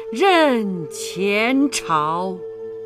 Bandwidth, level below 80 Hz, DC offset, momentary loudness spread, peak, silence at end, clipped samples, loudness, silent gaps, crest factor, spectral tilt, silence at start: 15.5 kHz; -60 dBFS; under 0.1%; 13 LU; -4 dBFS; 0 s; under 0.1%; -19 LUFS; none; 16 dB; -4 dB/octave; 0 s